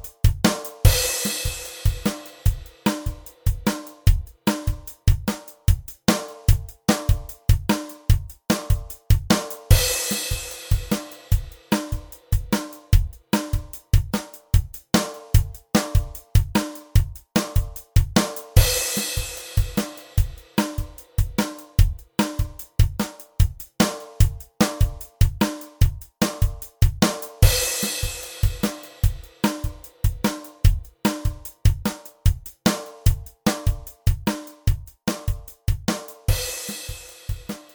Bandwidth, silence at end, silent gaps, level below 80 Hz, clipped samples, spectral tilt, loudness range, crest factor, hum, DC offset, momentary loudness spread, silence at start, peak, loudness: over 20 kHz; 0.15 s; none; -26 dBFS; under 0.1%; -4.5 dB/octave; 3 LU; 22 dB; none; under 0.1%; 8 LU; 0.05 s; 0 dBFS; -24 LUFS